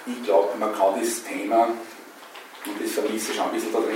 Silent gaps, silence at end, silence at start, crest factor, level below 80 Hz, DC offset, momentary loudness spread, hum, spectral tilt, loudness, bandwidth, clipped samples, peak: none; 0 s; 0 s; 18 dB; -90 dBFS; under 0.1%; 19 LU; none; -2.5 dB/octave; -24 LUFS; 16.5 kHz; under 0.1%; -6 dBFS